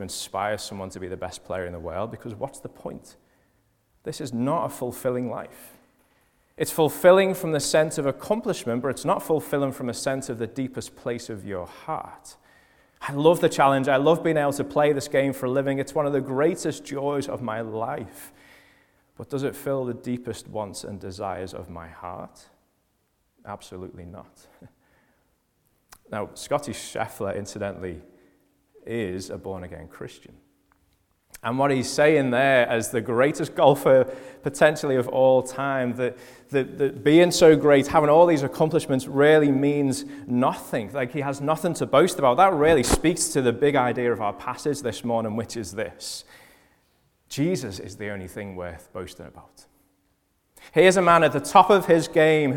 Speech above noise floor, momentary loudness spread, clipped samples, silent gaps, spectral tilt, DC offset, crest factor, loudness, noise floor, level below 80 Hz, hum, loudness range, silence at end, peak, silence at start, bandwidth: 47 dB; 19 LU; under 0.1%; none; -5 dB/octave; under 0.1%; 22 dB; -23 LUFS; -70 dBFS; -52 dBFS; none; 15 LU; 0 s; -2 dBFS; 0 s; 19 kHz